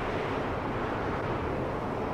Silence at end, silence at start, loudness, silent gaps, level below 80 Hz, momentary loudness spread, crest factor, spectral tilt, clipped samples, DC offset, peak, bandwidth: 0 s; 0 s; -32 LUFS; none; -44 dBFS; 1 LU; 12 dB; -7 dB/octave; under 0.1%; under 0.1%; -20 dBFS; 15.5 kHz